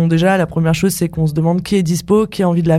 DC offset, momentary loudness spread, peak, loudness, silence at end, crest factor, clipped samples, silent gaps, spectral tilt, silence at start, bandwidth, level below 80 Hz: under 0.1%; 3 LU; -2 dBFS; -15 LUFS; 0 s; 12 dB; under 0.1%; none; -6.5 dB/octave; 0 s; 15 kHz; -40 dBFS